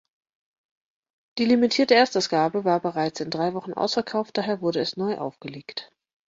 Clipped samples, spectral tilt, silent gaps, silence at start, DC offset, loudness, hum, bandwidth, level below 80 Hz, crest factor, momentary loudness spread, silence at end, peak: under 0.1%; -4.5 dB/octave; none; 1.35 s; under 0.1%; -23 LUFS; none; 7.8 kHz; -68 dBFS; 20 dB; 16 LU; 0.45 s; -4 dBFS